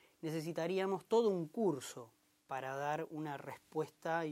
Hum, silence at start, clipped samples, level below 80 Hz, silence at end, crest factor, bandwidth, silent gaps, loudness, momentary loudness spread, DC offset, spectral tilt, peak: none; 0.25 s; under 0.1%; -88 dBFS; 0 s; 18 dB; 16 kHz; none; -39 LUFS; 12 LU; under 0.1%; -5.5 dB/octave; -20 dBFS